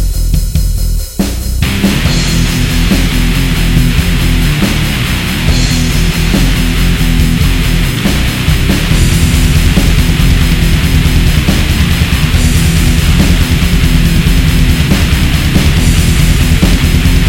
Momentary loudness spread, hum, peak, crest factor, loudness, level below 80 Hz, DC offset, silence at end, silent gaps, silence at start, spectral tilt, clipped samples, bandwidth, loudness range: 3 LU; none; 0 dBFS; 8 dB; -10 LUFS; -12 dBFS; 1%; 0 s; none; 0 s; -5 dB/octave; 0.7%; 17 kHz; 2 LU